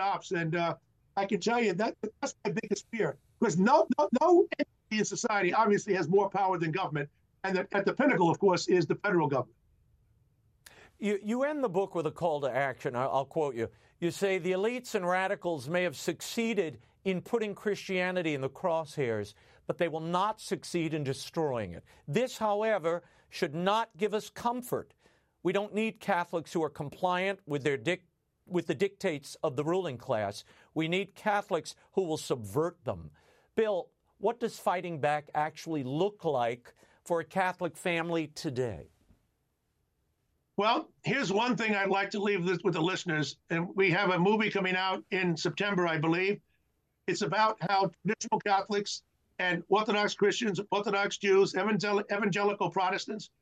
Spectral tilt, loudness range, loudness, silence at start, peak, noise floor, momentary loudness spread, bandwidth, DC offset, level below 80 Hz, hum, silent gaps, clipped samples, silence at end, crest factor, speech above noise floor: -5 dB/octave; 5 LU; -31 LUFS; 0 s; -12 dBFS; -77 dBFS; 9 LU; 14.5 kHz; under 0.1%; -72 dBFS; none; none; under 0.1%; 0.15 s; 18 dB; 47 dB